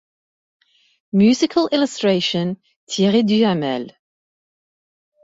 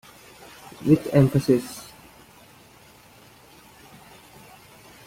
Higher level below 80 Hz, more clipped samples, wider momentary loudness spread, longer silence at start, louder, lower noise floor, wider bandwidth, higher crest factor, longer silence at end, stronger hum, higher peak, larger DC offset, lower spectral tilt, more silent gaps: second, -62 dBFS vs -56 dBFS; neither; second, 12 LU vs 28 LU; first, 1.15 s vs 0.8 s; first, -18 LUFS vs -21 LUFS; first, under -90 dBFS vs -51 dBFS; second, 8 kHz vs 16.5 kHz; second, 16 dB vs 22 dB; second, 1.35 s vs 3.25 s; neither; about the same, -4 dBFS vs -6 dBFS; neither; second, -5.5 dB/octave vs -7.5 dB/octave; first, 2.76-2.87 s vs none